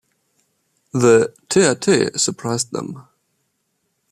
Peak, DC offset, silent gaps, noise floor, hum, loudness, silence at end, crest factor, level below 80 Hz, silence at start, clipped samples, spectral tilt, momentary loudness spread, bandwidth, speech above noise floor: -2 dBFS; under 0.1%; none; -70 dBFS; none; -17 LUFS; 1.1 s; 18 dB; -60 dBFS; 0.95 s; under 0.1%; -4 dB/octave; 14 LU; 15 kHz; 53 dB